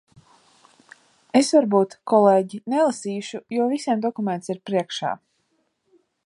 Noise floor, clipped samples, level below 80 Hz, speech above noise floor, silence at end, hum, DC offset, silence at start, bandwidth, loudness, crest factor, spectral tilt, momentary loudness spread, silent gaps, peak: -70 dBFS; under 0.1%; -74 dBFS; 49 dB; 1.1 s; none; under 0.1%; 1.35 s; 11.5 kHz; -22 LUFS; 20 dB; -5 dB/octave; 12 LU; none; -4 dBFS